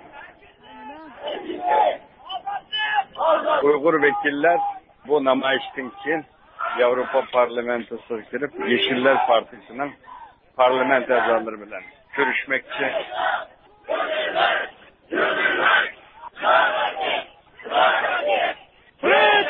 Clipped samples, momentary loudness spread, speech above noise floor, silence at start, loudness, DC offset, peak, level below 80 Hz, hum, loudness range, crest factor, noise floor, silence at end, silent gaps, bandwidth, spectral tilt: under 0.1%; 17 LU; 27 dB; 0.05 s; -21 LUFS; under 0.1%; -4 dBFS; -64 dBFS; none; 3 LU; 18 dB; -49 dBFS; 0 s; none; 5.2 kHz; -8 dB/octave